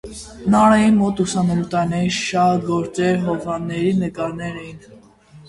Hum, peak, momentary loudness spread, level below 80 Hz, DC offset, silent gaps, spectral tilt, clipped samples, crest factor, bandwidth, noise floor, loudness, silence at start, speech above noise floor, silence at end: none; -2 dBFS; 14 LU; -46 dBFS; under 0.1%; none; -6 dB/octave; under 0.1%; 18 dB; 11.5 kHz; -46 dBFS; -18 LUFS; 0.05 s; 27 dB; 0.05 s